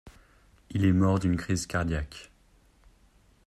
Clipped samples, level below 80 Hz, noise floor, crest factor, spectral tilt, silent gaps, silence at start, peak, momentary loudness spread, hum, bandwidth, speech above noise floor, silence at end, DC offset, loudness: under 0.1%; -48 dBFS; -61 dBFS; 18 dB; -6.5 dB/octave; none; 0.05 s; -12 dBFS; 14 LU; none; 13 kHz; 35 dB; 1.2 s; under 0.1%; -27 LUFS